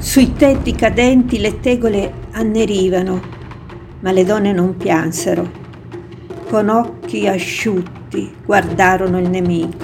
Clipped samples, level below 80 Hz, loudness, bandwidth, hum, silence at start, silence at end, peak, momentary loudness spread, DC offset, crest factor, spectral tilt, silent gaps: under 0.1%; -32 dBFS; -15 LUFS; 17.5 kHz; none; 0 s; 0 s; 0 dBFS; 20 LU; under 0.1%; 16 dB; -5.5 dB/octave; none